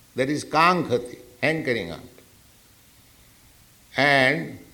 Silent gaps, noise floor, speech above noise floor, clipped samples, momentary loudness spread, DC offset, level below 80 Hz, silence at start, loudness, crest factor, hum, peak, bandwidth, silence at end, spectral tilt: none; -54 dBFS; 32 dB; under 0.1%; 14 LU; under 0.1%; -60 dBFS; 0.15 s; -22 LUFS; 22 dB; none; -4 dBFS; 19.5 kHz; 0.1 s; -5 dB/octave